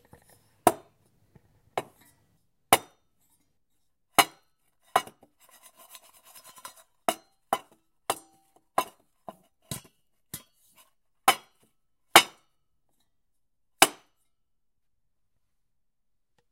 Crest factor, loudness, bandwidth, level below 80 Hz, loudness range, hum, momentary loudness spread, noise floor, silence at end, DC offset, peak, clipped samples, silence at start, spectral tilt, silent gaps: 32 dB; -26 LUFS; 16 kHz; -72 dBFS; 11 LU; none; 25 LU; -81 dBFS; 2.6 s; under 0.1%; 0 dBFS; under 0.1%; 0.65 s; -1 dB/octave; none